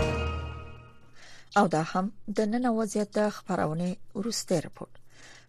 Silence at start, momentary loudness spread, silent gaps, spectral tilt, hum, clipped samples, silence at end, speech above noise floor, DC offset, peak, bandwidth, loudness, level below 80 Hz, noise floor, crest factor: 0 s; 17 LU; none; -5.5 dB/octave; none; under 0.1%; 0.1 s; 20 dB; under 0.1%; -12 dBFS; 13.5 kHz; -29 LUFS; -46 dBFS; -48 dBFS; 18 dB